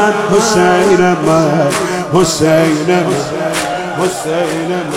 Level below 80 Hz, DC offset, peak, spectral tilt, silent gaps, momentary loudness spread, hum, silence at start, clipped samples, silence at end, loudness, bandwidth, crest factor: -44 dBFS; under 0.1%; 0 dBFS; -5 dB/octave; none; 7 LU; none; 0 s; under 0.1%; 0 s; -12 LUFS; 16 kHz; 12 dB